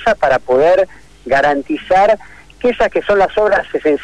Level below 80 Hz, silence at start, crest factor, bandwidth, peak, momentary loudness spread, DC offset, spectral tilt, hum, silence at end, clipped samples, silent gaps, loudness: -40 dBFS; 0 s; 10 dB; 10.5 kHz; -4 dBFS; 7 LU; under 0.1%; -5 dB/octave; none; 0 s; under 0.1%; none; -14 LUFS